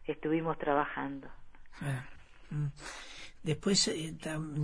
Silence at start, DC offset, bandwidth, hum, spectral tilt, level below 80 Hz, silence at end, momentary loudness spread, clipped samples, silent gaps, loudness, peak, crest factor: 0 s; under 0.1%; 10.5 kHz; none; -4 dB/octave; -56 dBFS; 0 s; 17 LU; under 0.1%; none; -34 LUFS; -16 dBFS; 20 dB